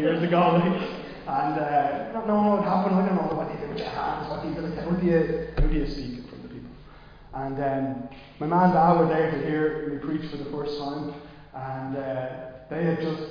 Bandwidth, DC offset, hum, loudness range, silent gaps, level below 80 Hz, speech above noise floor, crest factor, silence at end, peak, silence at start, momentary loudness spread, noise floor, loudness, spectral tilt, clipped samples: 5.2 kHz; under 0.1%; none; 7 LU; none; -38 dBFS; 22 dB; 16 dB; 0 s; -8 dBFS; 0 s; 16 LU; -47 dBFS; -26 LUFS; -9 dB/octave; under 0.1%